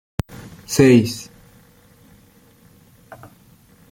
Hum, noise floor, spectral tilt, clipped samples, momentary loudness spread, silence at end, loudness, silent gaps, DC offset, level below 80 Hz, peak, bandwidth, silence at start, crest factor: none; -51 dBFS; -6 dB/octave; under 0.1%; 26 LU; 2.7 s; -16 LUFS; none; under 0.1%; -48 dBFS; -2 dBFS; 16.5 kHz; 0.7 s; 20 dB